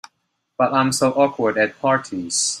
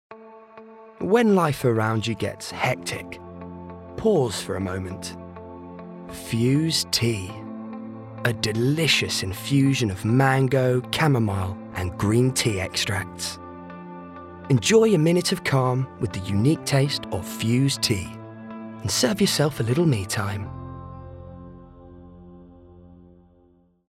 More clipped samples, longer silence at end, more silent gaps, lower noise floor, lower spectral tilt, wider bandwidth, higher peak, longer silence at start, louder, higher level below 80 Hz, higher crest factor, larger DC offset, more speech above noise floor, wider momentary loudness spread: neither; second, 0 s vs 0.95 s; neither; first, -72 dBFS vs -59 dBFS; second, -3.5 dB/octave vs -5 dB/octave; about the same, 15.5 kHz vs 16 kHz; first, -2 dBFS vs -6 dBFS; first, 0.6 s vs 0.1 s; first, -19 LUFS vs -23 LUFS; second, -64 dBFS vs -54 dBFS; about the same, 18 dB vs 18 dB; neither; first, 53 dB vs 37 dB; second, 5 LU vs 20 LU